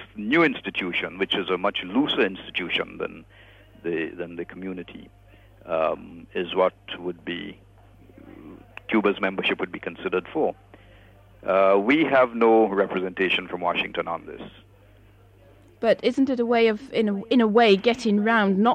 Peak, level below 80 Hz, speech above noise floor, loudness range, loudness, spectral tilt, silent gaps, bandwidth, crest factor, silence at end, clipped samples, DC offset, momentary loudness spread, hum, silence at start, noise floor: -6 dBFS; -58 dBFS; 30 dB; 8 LU; -23 LUFS; -6 dB/octave; none; 9.2 kHz; 18 dB; 0 s; under 0.1%; under 0.1%; 16 LU; none; 0 s; -53 dBFS